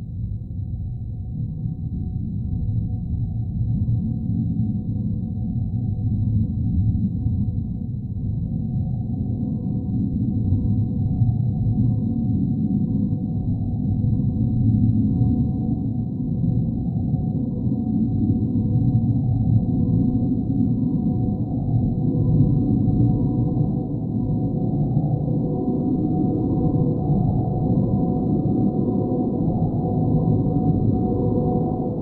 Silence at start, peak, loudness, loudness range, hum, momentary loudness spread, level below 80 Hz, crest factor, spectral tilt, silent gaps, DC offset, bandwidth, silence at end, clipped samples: 0 s; -6 dBFS; -22 LUFS; 4 LU; none; 6 LU; -34 dBFS; 16 dB; -15 dB/octave; none; under 0.1%; 1.3 kHz; 0 s; under 0.1%